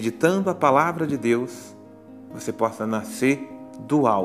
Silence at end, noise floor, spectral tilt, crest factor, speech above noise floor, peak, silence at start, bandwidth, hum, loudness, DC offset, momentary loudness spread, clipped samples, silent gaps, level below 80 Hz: 0 s; -44 dBFS; -6 dB/octave; 20 dB; 22 dB; -4 dBFS; 0 s; 15.5 kHz; none; -23 LUFS; under 0.1%; 19 LU; under 0.1%; none; -66 dBFS